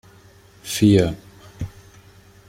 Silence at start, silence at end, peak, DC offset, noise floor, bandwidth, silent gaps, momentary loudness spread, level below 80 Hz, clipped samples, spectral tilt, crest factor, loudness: 0.65 s; 0.8 s; -2 dBFS; under 0.1%; -49 dBFS; 16.5 kHz; none; 21 LU; -46 dBFS; under 0.1%; -6 dB/octave; 20 dB; -18 LUFS